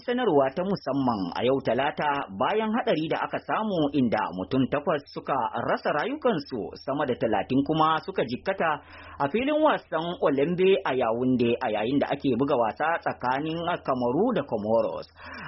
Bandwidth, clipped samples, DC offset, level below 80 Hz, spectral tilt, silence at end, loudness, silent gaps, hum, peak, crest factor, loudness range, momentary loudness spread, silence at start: 6 kHz; under 0.1%; under 0.1%; -60 dBFS; -4.5 dB/octave; 0 s; -26 LUFS; none; none; -10 dBFS; 16 dB; 2 LU; 6 LU; 0.05 s